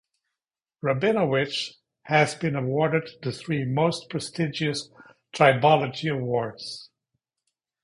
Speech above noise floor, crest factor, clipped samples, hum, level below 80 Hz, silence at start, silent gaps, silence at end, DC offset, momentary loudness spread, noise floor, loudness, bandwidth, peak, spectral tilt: 65 dB; 22 dB; under 0.1%; none; -64 dBFS; 0.85 s; none; 0.95 s; under 0.1%; 13 LU; -89 dBFS; -24 LUFS; 11.5 kHz; -4 dBFS; -5.5 dB/octave